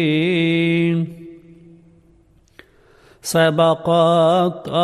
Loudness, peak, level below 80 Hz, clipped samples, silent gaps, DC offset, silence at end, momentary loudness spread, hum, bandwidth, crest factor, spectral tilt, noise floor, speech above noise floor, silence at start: -17 LUFS; -2 dBFS; -58 dBFS; under 0.1%; none; under 0.1%; 0 s; 11 LU; none; 13.5 kHz; 16 dB; -6 dB/octave; -54 dBFS; 37 dB; 0 s